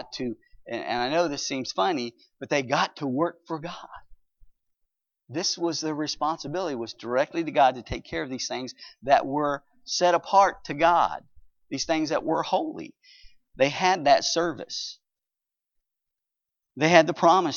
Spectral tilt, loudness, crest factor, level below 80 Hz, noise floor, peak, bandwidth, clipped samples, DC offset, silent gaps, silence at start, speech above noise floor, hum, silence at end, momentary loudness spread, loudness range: -3.5 dB/octave; -25 LUFS; 26 dB; -58 dBFS; -88 dBFS; 0 dBFS; 7.4 kHz; under 0.1%; under 0.1%; none; 0 s; 63 dB; none; 0 s; 15 LU; 7 LU